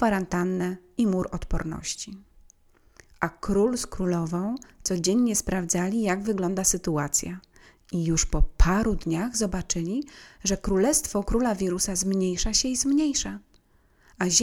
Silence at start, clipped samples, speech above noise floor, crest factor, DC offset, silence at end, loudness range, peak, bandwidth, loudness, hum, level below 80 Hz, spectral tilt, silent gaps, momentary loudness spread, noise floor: 0 s; under 0.1%; 36 dB; 20 dB; under 0.1%; 0 s; 5 LU; -6 dBFS; 17.5 kHz; -26 LUFS; none; -34 dBFS; -4 dB/octave; none; 9 LU; -61 dBFS